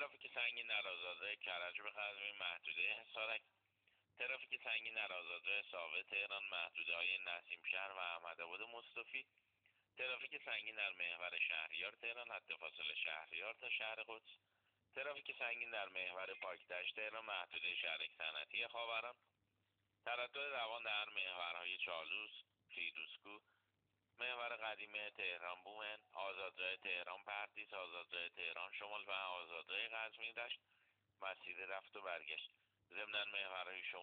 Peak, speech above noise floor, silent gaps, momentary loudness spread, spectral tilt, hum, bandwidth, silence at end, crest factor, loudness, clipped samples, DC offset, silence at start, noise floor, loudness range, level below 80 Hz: -28 dBFS; 38 dB; none; 8 LU; 3.5 dB/octave; none; 4.6 kHz; 0 s; 20 dB; -45 LUFS; under 0.1%; under 0.1%; 0 s; -86 dBFS; 4 LU; under -90 dBFS